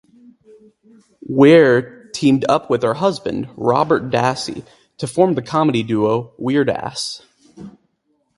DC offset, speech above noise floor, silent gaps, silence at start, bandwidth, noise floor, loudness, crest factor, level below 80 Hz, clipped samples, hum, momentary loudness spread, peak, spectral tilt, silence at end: under 0.1%; 50 dB; none; 1.3 s; 11.5 kHz; -66 dBFS; -17 LUFS; 18 dB; -56 dBFS; under 0.1%; none; 14 LU; 0 dBFS; -6 dB/octave; 0.7 s